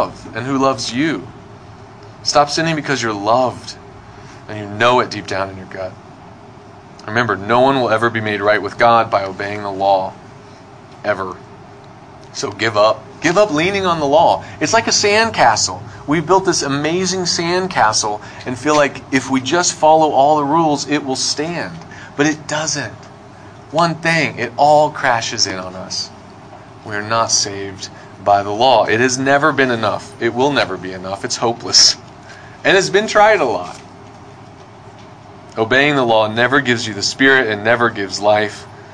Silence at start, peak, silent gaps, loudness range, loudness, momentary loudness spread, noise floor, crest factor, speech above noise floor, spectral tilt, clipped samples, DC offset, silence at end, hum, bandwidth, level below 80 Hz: 0 s; 0 dBFS; none; 6 LU; -15 LUFS; 15 LU; -39 dBFS; 16 dB; 23 dB; -3 dB/octave; under 0.1%; under 0.1%; 0 s; none; 10.5 kHz; -52 dBFS